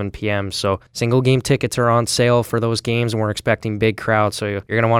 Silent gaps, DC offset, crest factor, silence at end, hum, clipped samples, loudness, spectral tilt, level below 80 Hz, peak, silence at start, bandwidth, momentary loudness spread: none; under 0.1%; 16 dB; 0 s; none; under 0.1%; -19 LUFS; -5.5 dB/octave; -46 dBFS; -2 dBFS; 0 s; 16 kHz; 6 LU